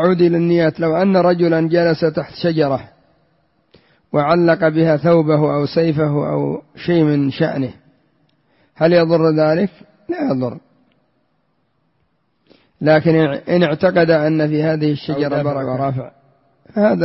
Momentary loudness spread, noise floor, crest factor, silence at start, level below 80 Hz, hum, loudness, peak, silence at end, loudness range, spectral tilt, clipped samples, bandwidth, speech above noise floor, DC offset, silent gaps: 9 LU; -65 dBFS; 14 dB; 0 s; -54 dBFS; none; -16 LUFS; -2 dBFS; 0 s; 5 LU; -11.5 dB/octave; under 0.1%; 5.8 kHz; 50 dB; under 0.1%; none